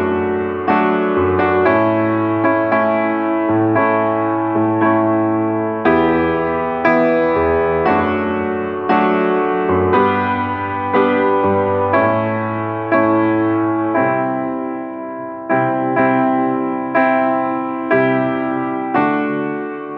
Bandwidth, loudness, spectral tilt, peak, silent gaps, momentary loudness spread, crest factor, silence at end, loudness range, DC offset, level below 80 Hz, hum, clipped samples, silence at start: 5.4 kHz; -16 LUFS; -9.5 dB/octave; 0 dBFS; none; 6 LU; 16 dB; 0 s; 2 LU; under 0.1%; -52 dBFS; none; under 0.1%; 0 s